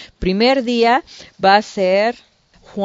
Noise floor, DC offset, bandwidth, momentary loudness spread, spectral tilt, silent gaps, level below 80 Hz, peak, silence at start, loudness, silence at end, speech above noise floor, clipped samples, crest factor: -41 dBFS; under 0.1%; 7.8 kHz; 7 LU; -5 dB/octave; none; -40 dBFS; 0 dBFS; 0 s; -16 LUFS; 0 s; 25 dB; under 0.1%; 16 dB